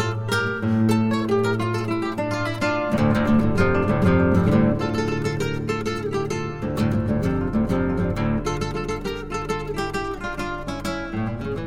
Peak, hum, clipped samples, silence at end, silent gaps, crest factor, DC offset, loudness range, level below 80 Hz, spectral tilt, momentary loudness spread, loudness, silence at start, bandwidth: -6 dBFS; none; under 0.1%; 0 s; none; 16 dB; under 0.1%; 6 LU; -38 dBFS; -7 dB/octave; 9 LU; -23 LUFS; 0 s; 15.5 kHz